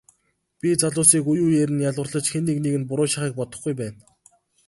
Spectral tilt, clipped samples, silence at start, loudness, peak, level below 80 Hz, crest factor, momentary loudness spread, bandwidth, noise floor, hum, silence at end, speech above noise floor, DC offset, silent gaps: -4.5 dB/octave; under 0.1%; 0.65 s; -21 LUFS; 0 dBFS; -60 dBFS; 22 dB; 13 LU; 12 kHz; -69 dBFS; none; 0.75 s; 47 dB; under 0.1%; none